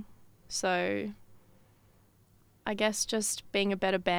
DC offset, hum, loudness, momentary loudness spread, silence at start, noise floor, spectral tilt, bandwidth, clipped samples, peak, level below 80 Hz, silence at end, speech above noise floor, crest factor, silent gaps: under 0.1%; none; -31 LUFS; 11 LU; 0 s; -63 dBFS; -3 dB/octave; over 20 kHz; under 0.1%; -14 dBFS; -64 dBFS; 0 s; 33 dB; 20 dB; none